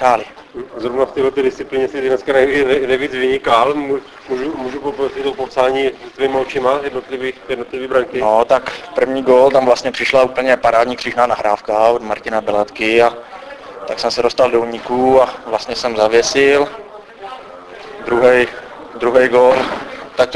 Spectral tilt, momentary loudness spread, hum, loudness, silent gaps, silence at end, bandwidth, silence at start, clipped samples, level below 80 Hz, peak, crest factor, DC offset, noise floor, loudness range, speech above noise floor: -4 dB/octave; 15 LU; none; -15 LUFS; none; 0 s; 11 kHz; 0 s; under 0.1%; -48 dBFS; 0 dBFS; 16 dB; under 0.1%; -34 dBFS; 4 LU; 19 dB